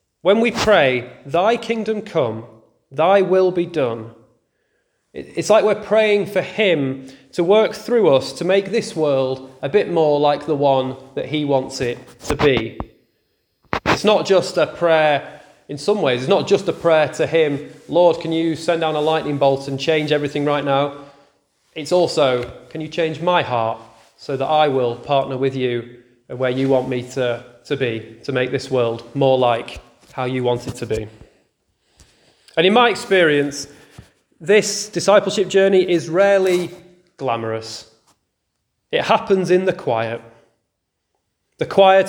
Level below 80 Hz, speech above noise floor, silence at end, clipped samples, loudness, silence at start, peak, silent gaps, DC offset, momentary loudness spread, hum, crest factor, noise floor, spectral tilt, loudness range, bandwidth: -50 dBFS; 57 dB; 0 s; under 0.1%; -18 LUFS; 0.25 s; 0 dBFS; none; under 0.1%; 14 LU; none; 18 dB; -75 dBFS; -5 dB/octave; 4 LU; 17.5 kHz